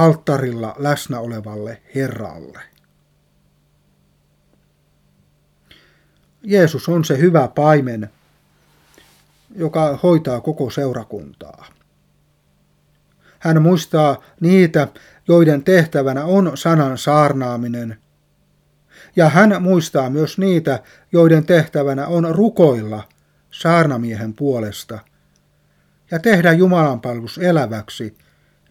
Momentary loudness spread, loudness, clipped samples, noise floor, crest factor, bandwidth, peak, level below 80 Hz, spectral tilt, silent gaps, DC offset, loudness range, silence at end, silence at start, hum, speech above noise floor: 16 LU; -16 LUFS; under 0.1%; -59 dBFS; 18 dB; 15.5 kHz; 0 dBFS; -58 dBFS; -7 dB/octave; none; under 0.1%; 9 LU; 0.6 s; 0 s; 50 Hz at -45 dBFS; 44 dB